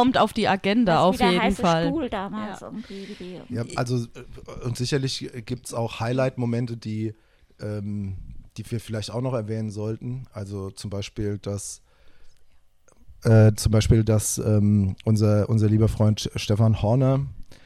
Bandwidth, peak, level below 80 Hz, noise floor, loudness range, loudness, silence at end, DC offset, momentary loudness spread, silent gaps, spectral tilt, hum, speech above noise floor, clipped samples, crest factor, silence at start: 13.5 kHz; -6 dBFS; -42 dBFS; -54 dBFS; 10 LU; -24 LUFS; 0.1 s; under 0.1%; 16 LU; none; -6 dB/octave; none; 31 dB; under 0.1%; 16 dB; 0 s